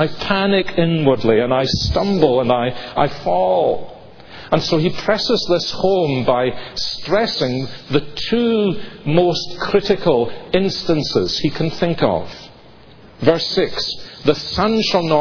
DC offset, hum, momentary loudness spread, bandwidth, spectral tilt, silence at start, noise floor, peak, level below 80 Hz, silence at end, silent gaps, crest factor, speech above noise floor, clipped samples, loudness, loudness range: under 0.1%; none; 6 LU; 5.4 kHz; -6 dB/octave; 0 s; -44 dBFS; 0 dBFS; -40 dBFS; 0 s; none; 18 dB; 27 dB; under 0.1%; -18 LUFS; 3 LU